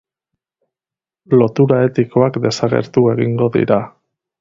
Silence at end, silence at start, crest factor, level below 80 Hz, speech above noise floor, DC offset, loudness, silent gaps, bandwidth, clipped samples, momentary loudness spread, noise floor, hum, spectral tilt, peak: 0.5 s; 1.3 s; 16 dB; -54 dBFS; 76 dB; under 0.1%; -15 LUFS; none; 7.8 kHz; under 0.1%; 4 LU; -90 dBFS; none; -7.5 dB/octave; 0 dBFS